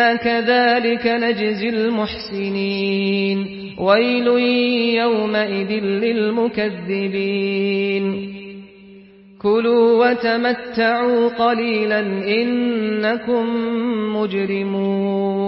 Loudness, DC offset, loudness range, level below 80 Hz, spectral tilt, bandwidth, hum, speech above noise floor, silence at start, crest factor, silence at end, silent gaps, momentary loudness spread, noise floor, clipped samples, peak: -18 LUFS; under 0.1%; 3 LU; -56 dBFS; -10.5 dB/octave; 5.8 kHz; none; 26 dB; 0 s; 16 dB; 0 s; none; 8 LU; -44 dBFS; under 0.1%; -2 dBFS